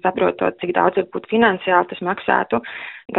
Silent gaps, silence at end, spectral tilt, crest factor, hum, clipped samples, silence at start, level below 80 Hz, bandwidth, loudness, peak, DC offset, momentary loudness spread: none; 0 s; -3 dB/octave; 18 dB; none; under 0.1%; 0.05 s; -56 dBFS; 4 kHz; -19 LUFS; -2 dBFS; under 0.1%; 7 LU